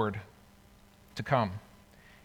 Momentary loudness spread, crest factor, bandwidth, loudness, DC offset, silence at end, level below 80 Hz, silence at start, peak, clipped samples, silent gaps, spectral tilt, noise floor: 17 LU; 22 dB; 20 kHz; -33 LUFS; under 0.1%; 0.65 s; -64 dBFS; 0 s; -14 dBFS; under 0.1%; none; -7 dB/octave; -59 dBFS